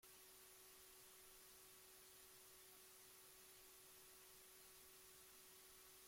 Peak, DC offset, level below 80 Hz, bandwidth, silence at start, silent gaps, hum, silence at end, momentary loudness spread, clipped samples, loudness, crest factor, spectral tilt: -52 dBFS; under 0.1%; -86 dBFS; 16.5 kHz; 0 s; none; none; 0 s; 0 LU; under 0.1%; -63 LUFS; 14 dB; -0.5 dB/octave